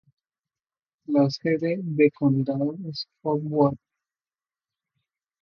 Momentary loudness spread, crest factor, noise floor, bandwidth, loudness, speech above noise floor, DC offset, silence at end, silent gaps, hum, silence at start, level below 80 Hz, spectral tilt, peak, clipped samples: 10 LU; 20 dB; under -90 dBFS; 6.8 kHz; -24 LUFS; over 67 dB; under 0.1%; 1.65 s; none; none; 1.1 s; -66 dBFS; -8 dB/octave; -6 dBFS; under 0.1%